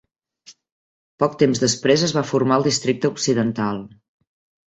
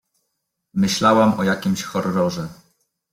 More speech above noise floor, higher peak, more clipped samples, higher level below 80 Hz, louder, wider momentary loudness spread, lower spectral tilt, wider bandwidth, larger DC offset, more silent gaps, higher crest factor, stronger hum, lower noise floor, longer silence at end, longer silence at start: second, 31 dB vs 58 dB; about the same, -2 dBFS vs -2 dBFS; neither; about the same, -58 dBFS vs -56 dBFS; about the same, -19 LUFS vs -19 LUFS; second, 6 LU vs 14 LU; about the same, -4.5 dB/octave vs -5 dB/octave; second, 8.4 kHz vs 16 kHz; neither; first, 0.72-1.18 s vs none; about the same, 18 dB vs 18 dB; neither; second, -51 dBFS vs -76 dBFS; first, 0.8 s vs 0.6 s; second, 0.5 s vs 0.75 s